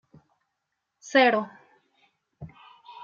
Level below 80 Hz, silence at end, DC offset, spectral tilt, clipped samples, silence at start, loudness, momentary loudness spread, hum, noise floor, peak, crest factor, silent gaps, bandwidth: -68 dBFS; 0 s; under 0.1%; -4 dB/octave; under 0.1%; 1.05 s; -22 LUFS; 27 LU; none; -81 dBFS; -8 dBFS; 22 dB; none; 7.2 kHz